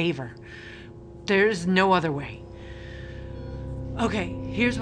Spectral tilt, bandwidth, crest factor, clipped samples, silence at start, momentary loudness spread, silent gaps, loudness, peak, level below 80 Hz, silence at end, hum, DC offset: -6 dB/octave; 10 kHz; 20 dB; under 0.1%; 0 s; 20 LU; none; -25 LUFS; -6 dBFS; -44 dBFS; 0 s; none; under 0.1%